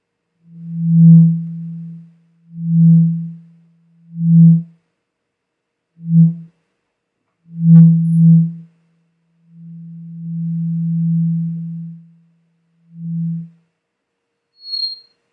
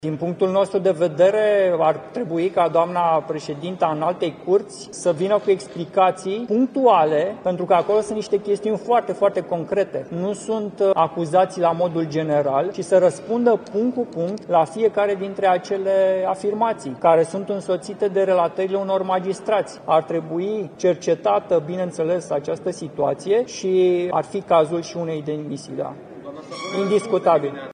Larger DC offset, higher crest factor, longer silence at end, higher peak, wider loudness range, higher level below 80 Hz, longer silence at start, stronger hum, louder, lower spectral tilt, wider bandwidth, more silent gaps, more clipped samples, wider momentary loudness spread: neither; about the same, 16 dB vs 16 dB; first, 0.4 s vs 0 s; first, 0 dBFS vs -4 dBFS; first, 11 LU vs 3 LU; second, -76 dBFS vs -66 dBFS; first, 0.55 s vs 0 s; neither; first, -13 LUFS vs -21 LUFS; first, -11.5 dB/octave vs -6 dB/octave; second, 4.6 kHz vs 10 kHz; neither; neither; first, 25 LU vs 9 LU